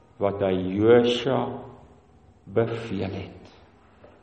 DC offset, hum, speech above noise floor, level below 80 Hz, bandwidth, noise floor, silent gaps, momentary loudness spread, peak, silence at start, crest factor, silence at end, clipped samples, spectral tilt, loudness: under 0.1%; none; 32 dB; -58 dBFS; 8.4 kHz; -55 dBFS; none; 19 LU; -6 dBFS; 0.2 s; 18 dB; 0.75 s; under 0.1%; -7 dB/octave; -24 LUFS